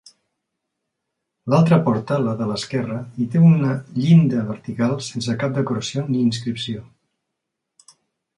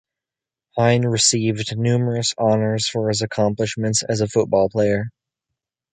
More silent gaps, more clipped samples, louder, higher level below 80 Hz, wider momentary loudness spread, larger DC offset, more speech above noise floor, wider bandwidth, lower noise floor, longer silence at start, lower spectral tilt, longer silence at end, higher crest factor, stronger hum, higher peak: neither; neither; about the same, -20 LUFS vs -19 LUFS; second, -58 dBFS vs -52 dBFS; first, 12 LU vs 6 LU; neither; second, 61 dB vs 69 dB; about the same, 10.5 kHz vs 9.6 kHz; second, -80 dBFS vs -88 dBFS; first, 1.45 s vs 0.75 s; first, -7 dB/octave vs -4.5 dB/octave; first, 1.55 s vs 0.85 s; about the same, 16 dB vs 18 dB; neither; about the same, -4 dBFS vs -2 dBFS